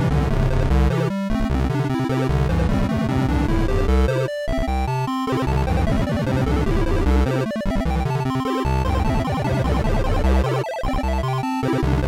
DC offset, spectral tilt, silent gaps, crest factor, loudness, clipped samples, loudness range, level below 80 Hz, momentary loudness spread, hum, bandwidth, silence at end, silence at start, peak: 0.2%; -7.5 dB/octave; none; 8 dB; -21 LUFS; under 0.1%; 1 LU; -24 dBFS; 4 LU; none; 14.5 kHz; 0 s; 0 s; -12 dBFS